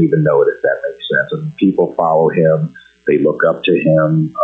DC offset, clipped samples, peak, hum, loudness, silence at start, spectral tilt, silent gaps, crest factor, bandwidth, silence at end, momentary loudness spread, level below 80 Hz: under 0.1%; under 0.1%; -2 dBFS; none; -14 LUFS; 0 s; -9.5 dB/octave; none; 10 dB; 4 kHz; 0 s; 6 LU; -58 dBFS